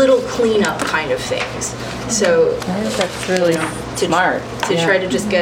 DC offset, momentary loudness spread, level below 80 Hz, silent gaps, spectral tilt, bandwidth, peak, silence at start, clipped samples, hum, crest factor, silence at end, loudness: under 0.1%; 7 LU; -42 dBFS; none; -4 dB/octave; 17 kHz; -2 dBFS; 0 s; under 0.1%; none; 14 dB; 0 s; -17 LUFS